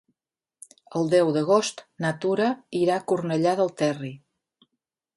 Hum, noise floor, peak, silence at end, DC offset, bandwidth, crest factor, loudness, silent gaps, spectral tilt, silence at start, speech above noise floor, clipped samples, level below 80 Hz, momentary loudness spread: none; -87 dBFS; -8 dBFS; 1 s; under 0.1%; 11.5 kHz; 18 dB; -24 LUFS; none; -5.5 dB/octave; 0.9 s; 63 dB; under 0.1%; -70 dBFS; 10 LU